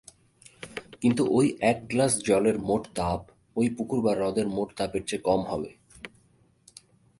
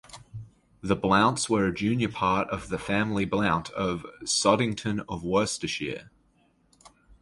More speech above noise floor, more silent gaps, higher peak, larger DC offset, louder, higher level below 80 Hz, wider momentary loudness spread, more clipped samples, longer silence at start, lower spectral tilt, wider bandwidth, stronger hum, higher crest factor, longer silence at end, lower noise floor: about the same, 37 dB vs 39 dB; neither; about the same, -8 dBFS vs -6 dBFS; neither; about the same, -26 LUFS vs -26 LUFS; about the same, -54 dBFS vs -52 dBFS; first, 17 LU vs 14 LU; neither; first, 0.6 s vs 0.1 s; about the same, -5 dB/octave vs -4.5 dB/octave; about the same, 11.5 kHz vs 11.5 kHz; neither; about the same, 20 dB vs 22 dB; first, 1.1 s vs 0.35 s; about the same, -63 dBFS vs -65 dBFS